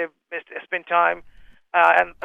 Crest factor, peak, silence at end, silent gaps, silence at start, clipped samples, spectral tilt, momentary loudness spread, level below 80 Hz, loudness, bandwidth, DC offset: 20 dB; -2 dBFS; 0.15 s; none; 0 s; under 0.1%; -4 dB/octave; 16 LU; -58 dBFS; -20 LUFS; 8.6 kHz; under 0.1%